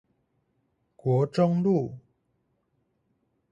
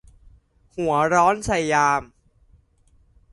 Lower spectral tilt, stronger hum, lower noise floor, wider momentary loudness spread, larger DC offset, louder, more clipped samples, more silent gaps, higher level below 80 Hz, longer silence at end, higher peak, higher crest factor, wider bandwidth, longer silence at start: first, -9.5 dB/octave vs -4.5 dB/octave; neither; first, -74 dBFS vs -59 dBFS; about the same, 10 LU vs 9 LU; neither; second, -25 LUFS vs -20 LUFS; neither; neither; second, -68 dBFS vs -48 dBFS; first, 1.55 s vs 1.3 s; second, -10 dBFS vs -4 dBFS; about the same, 18 dB vs 20 dB; second, 7.8 kHz vs 11.5 kHz; first, 1.05 s vs 0.75 s